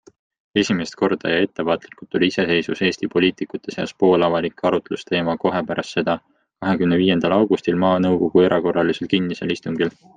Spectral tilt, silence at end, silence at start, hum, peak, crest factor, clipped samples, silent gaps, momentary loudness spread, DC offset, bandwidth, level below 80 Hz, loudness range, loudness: -6 dB/octave; 0.25 s; 0.55 s; none; -2 dBFS; 18 dB; under 0.1%; none; 8 LU; under 0.1%; 9.2 kHz; -58 dBFS; 3 LU; -20 LUFS